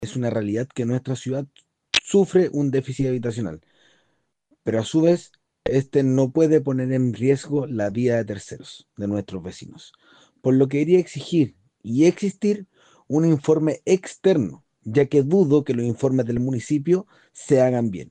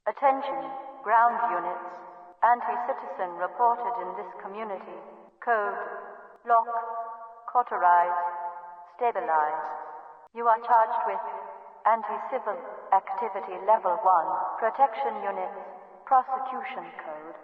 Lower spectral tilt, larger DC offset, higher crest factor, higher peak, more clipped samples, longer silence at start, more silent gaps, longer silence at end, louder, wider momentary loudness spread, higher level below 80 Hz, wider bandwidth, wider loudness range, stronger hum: about the same, -6.5 dB/octave vs -6.5 dB/octave; neither; about the same, 16 dB vs 18 dB; first, -6 dBFS vs -10 dBFS; neither; about the same, 0 s vs 0.05 s; neither; about the same, 0.05 s vs 0 s; first, -22 LUFS vs -27 LUFS; second, 13 LU vs 18 LU; first, -58 dBFS vs -82 dBFS; first, 9.6 kHz vs 4.8 kHz; about the same, 4 LU vs 4 LU; neither